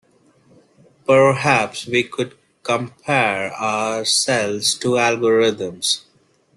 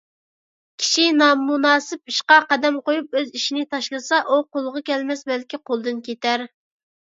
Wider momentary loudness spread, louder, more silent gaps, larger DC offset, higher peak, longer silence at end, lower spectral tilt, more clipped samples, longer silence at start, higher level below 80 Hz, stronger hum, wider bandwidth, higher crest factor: second, 9 LU vs 12 LU; about the same, -18 LUFS vs -20 LUFS; neither; neither; about the same, -2 dBFS vs 0 dBFS; about the same, 0.55 s vs 0.55 s; first, -3 dB/octave vs -1 dB/octave; neither; first, 1.1 s vs 0.8 s; first, -60 dBFS vs -78 dBFS; neither; first, 12.5 kHz vs 7.8 kHz; about the same, 18 dB vs 20 dB